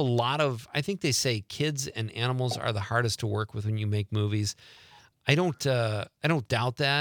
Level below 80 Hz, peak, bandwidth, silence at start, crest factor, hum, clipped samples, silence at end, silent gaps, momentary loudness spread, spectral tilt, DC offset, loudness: -64 dBFS; -6 dBFS; 19 kHz; 0 s; 22 dB; none; under 0.1%; 0 s; none; 6 LU; -4.5 dB/octave; under 0.1%; -28 LUFS